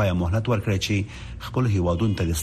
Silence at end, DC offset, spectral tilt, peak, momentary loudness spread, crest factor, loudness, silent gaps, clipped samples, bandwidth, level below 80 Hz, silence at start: 0 s; under 0.1%; -6 dB/octave; -10 dBFS; 7 LU; 12 dB; -24 LUFS; none; under 0.1%; 14 kHz; -38 dBFS; 0 s